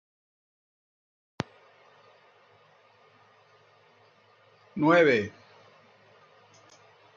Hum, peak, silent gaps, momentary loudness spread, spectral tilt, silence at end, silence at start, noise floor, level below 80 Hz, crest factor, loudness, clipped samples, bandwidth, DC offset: none; -8 dBFS; none; 19 LU; -6.5 dB/octave; 1.85 s; 4.75 s; -61 dBFS; -76 dBFS; 24 dB; -25 LUFS; under 0.1%; 7.4 kHz; under 0.1%